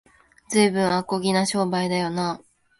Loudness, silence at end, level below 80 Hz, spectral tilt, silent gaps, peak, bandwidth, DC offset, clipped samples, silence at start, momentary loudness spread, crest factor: -23 LUFS; 0.45 s; -62 dBFS; -4.5 dB/octave; none; -6 dBFS; 11.5 kHz; under 0.1%; under 0.1%; 0.5 s; 7 LU; 16 dB